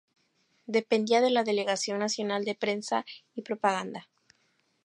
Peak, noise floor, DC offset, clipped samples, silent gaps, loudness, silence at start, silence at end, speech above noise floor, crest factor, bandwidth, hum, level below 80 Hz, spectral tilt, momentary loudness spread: -10 dBFS; -72 dBFS; under 0.1%; under 0.1%; none; -28 LUFS; 0.7 s; 0.8 s; 43 dB; 20 dB; 11.5 kHz; none; -82 dBFS; -3.5 dB/octave; 17 LU